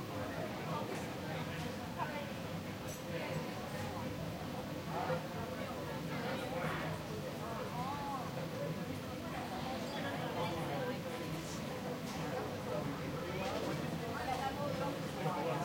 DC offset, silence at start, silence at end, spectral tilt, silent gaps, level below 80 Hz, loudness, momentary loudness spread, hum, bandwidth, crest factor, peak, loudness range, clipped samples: under 0.1%; 0 s; 0 s; -5.5 dB/octave; none; -62 dBFS; -41 LUFS; 4 LU; none; 16.5 kHz; 14 dB; -26 dBFS; 2 LU; under 0.1%